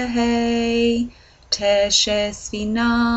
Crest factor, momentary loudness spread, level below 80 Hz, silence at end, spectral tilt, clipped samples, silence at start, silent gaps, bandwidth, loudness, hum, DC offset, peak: 16 dB; 9 LU; -40 dBFS; 0 s; -3 dB/octave; under 0.1%; 0 s; none; 8.4 kHz; -19 LUFS; none; under 0.1%; -4 dBFS